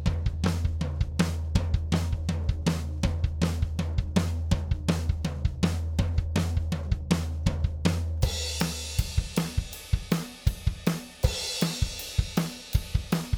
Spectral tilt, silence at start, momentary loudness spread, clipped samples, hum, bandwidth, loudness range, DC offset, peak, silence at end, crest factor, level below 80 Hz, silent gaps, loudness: -5.5 dB/octave; 0 s; 3 LU; under 0.1%; none; over 20 kHz; 1 LU; under 0.1%; -8 dBFS; 0 s; 20 dB; -32 dBFS; none; -29 LUFS